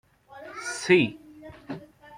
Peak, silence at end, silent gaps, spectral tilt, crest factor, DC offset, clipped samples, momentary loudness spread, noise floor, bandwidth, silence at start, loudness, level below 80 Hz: -6 dBFS; 0 s; none; -4.5 dB/octave; 22 dB; under 0.1%; under 0.1%; 25 LU; -46 dBFS; 11 kHz; 0.3 s; -24 LUFS; -64 dBFS